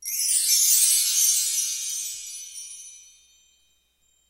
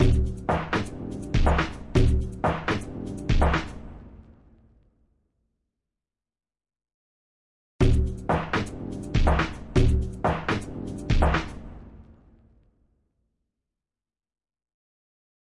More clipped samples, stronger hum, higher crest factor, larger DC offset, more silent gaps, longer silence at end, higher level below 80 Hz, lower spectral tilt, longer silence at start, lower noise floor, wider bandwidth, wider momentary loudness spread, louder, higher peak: neither; neither; about the same, 20 dB vs 18 dB; neither; second, none vs 6.94-7.79 s; second, 1.3 s vs 3.55 s; second, -72 dBFS vs -30 dBFS; second, 7.5 dB/octave vs -7 dB/octave; about the same, 0 s vs 0 s; second, -66 dBFS vs under -90 dBFS; first, 16 kHz vs 11.5 kHz; first, 20 LU vs 12 LU; first, -19 LUFS vs -26 LUFS; first, -6 dBFS vs -10 dBFS